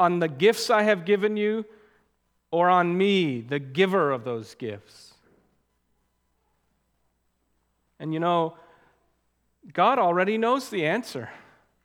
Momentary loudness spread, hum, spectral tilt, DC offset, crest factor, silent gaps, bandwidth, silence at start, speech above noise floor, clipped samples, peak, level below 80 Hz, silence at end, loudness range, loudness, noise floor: 16 LU; none; -5.5 dB/octave; under 0.1%; 20 dB; none; 18 kHz; 0 s; 49 dB; under 0.1%; -6 dBFS; -74 dBFS; 0.45 s; 12 LU; -24 LUFS; -72 dBFS